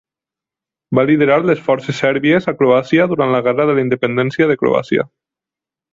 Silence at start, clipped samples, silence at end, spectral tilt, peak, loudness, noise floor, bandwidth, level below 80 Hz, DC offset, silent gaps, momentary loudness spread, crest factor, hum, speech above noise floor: 0.9 s; under 0.1%; 0.85 s; -7.5 dB/octave; 0 dBFS; -15 LUFS; -87 dBFS; 7.6 kHz; -56 dBFS; under 0.1%; none; 5 LU; 14 dB; none; 73 dB